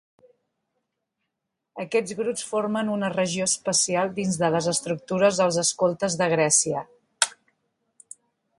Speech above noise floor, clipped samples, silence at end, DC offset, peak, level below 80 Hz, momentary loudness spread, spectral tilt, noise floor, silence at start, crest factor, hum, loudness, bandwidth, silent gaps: 58 dB; under 0.1%; 1.25 s; under 0.1%; -2 dBFS; -68 dBFS; 8 LU; -3 dB/octave; -82 dBFS; 1.75 s; 24 dB; none; -23 LUFS; 11.5 kHz; none